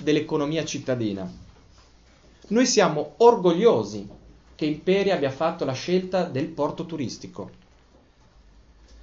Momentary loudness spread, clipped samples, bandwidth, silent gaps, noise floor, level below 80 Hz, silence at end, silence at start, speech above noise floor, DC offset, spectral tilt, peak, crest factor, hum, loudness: 17 LU; under 0.1%; 7.8 kHz; none; -56 dBFS; -56 dBFS; 1.5 s; 0 s; 33 dB; under 0.1%; -5 dB/octave; -4 dBFS; 22 dB; none; -23 LUFS